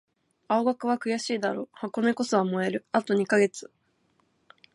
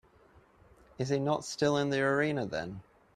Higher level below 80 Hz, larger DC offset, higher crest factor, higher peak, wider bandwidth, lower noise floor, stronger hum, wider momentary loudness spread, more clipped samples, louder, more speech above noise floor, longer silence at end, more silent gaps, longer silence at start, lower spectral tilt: second, -78 dBFS vs -64 dBFS; neither; about the same, 20 dB vs 16 dB; first, -8 dBFS vs -16 dBFS; second, 11.5 kHz vs 13 kHz; first, -69 dBFS vs -62 dBFS; neither; second, 6 LU vs 10 LU; neither; first, -27 LUFS vs -31 LUFS; first, 43 dB vs 31 dB; first, 1.15 s vs 0.35 s; neither; second, 0.5 s vs 1 s; about the same, -5 dB/octave vs -5.5 dB/octave